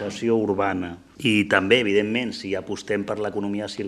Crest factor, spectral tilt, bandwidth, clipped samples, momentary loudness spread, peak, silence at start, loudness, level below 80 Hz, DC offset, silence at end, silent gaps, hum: 22 dB; -5 dB/octave; 12.5 kHz; under 0.1%; 11 LU; -2 dBFS; 0 s; -23 LUFS; -60 dBFS; under 0.1%; 0 s; none; none